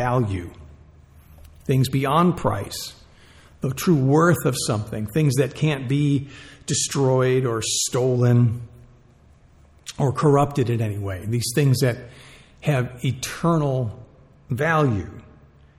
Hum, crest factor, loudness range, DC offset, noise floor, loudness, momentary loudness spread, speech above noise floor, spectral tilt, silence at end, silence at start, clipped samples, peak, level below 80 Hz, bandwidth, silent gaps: none; 16 dB; 3 LU; under 0.1%; -52 dBFS; -22 LUFS; 14 LU; 31 dB; -5.5 dB/octave; 0.6 s; 0 s; under 0.1%; -6 dBFS; -50 dBFS; 15.5 kHz; none